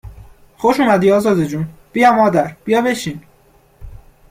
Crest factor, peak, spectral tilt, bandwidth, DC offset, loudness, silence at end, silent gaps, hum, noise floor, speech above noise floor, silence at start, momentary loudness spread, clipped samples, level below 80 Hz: 16 dB; -2 dBFS; -6 dB/octave; 16 kHz; under 0.1%; -15 LUFS; 0.35 s; none; none; -51 dBFS; 37 dB; 0.05 s; 12 LU; under 0.1%; -44 dBFS